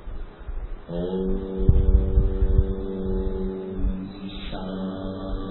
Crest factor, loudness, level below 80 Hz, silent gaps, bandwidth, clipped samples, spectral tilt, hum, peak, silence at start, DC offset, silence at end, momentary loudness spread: 20 dB; -27 LUFS; -26 dBFS; none; 4.2 kHz; under 0.1%; -12.5 dB/octave; none; -4 dBFS; 0 s; under 0.1%; 0 s; 16 LU